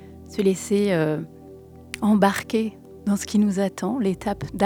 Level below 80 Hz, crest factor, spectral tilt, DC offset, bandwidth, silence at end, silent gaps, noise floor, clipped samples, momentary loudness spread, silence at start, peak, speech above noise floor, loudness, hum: -52 dBFS; 20 dB; -6 dB/octave; under 0.1%; 18 kHz; 0 s; none; -44 dBFS; under 0.1%; 12 LU; 0 s; -2 dBFS; 22 dB; -23 LUFS; none